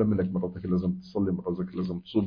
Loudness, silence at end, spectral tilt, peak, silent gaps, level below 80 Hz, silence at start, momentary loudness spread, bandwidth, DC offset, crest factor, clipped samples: -30 LUFS; 0 s; -10.5 dB/octave; -14 dBFS; none; -54 dBFS; 0 s; 5 LU; 5.2 kHz; under 0.1%; 14 dB; under 0.1%